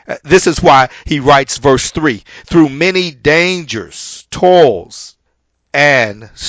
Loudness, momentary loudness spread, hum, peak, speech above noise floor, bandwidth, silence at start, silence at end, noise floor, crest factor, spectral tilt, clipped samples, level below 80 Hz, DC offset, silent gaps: -11 LUFS; 15 LU; none; 0 dBFS; 53 dB; 8 kHz; 0.1 s; 0 s; -64 dBFS; 12 dB; -4.5 dB/octave; 0.7%; -36 dBFS; under 0.1%; none